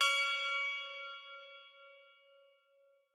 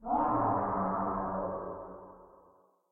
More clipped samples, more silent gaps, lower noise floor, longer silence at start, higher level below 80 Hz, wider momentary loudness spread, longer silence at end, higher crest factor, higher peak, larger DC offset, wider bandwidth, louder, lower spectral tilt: neither; neither; first, -71 dBFS vs -64 dBFS; about the same, 0 s vs 0 s; second, under -90 dBFS vs -56 dBFS; first, 24 LU vs 19 LU; first, 1.1 s vs 0.65 s; first, 22 dB vs 16 dB; about the same, -18 dBFS vs -18 dBFS; neither; first, 17.5 kHz vs 3.3 kHz; second, -35 LUFS vs -32 LUFS; second, 6 dB/octave vs -12 dB/octave